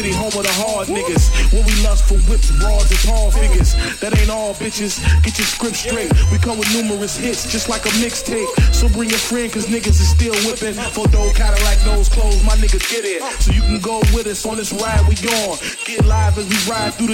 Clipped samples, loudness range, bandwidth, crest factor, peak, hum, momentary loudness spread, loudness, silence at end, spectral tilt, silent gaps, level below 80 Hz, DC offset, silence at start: under 0.1%; 1 LU; 16.5 kHz; 12 dB; -2 dBFS; none; 5 LU; -16 LUFS; 0 s; -4 dB/octave; none; -16 dBFS; under 0.1%; 0 s